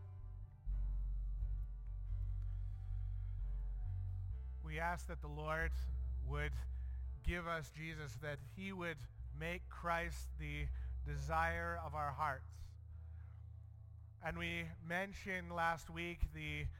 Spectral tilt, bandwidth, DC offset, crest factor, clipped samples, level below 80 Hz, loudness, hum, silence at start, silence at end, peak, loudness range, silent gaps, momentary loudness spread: -6 dB/octave; 16 kHz; under 0.1%; 18 dB; under 0.1%; -46 dBFS; -44 LUFS; none; 0 s; 0 s; -26 dBFS; 4 LU; none; 13 LU